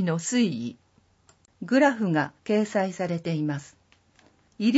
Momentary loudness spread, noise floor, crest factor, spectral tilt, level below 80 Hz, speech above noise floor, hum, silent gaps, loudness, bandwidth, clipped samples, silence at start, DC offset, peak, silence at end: 13 LU; -62 dBFS; 18 dB; -5.5 dB/octave; -70 dBFS; 36 dB; none; none; -26 LUFS; 8 kHz; under 0.1%; 0 s; under 0.1%; -8 dBFS; 0 s